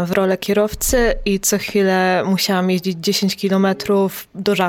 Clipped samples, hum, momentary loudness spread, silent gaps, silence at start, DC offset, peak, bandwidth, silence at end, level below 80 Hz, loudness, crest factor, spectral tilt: under 0.1%; none; 3 LU; none; 0 s; under 0.1%; -2 dBFS; 17.5 kHz; 0 s; -34 dBFS; -17 LUFS; 16 dB; -4.5 dB/octave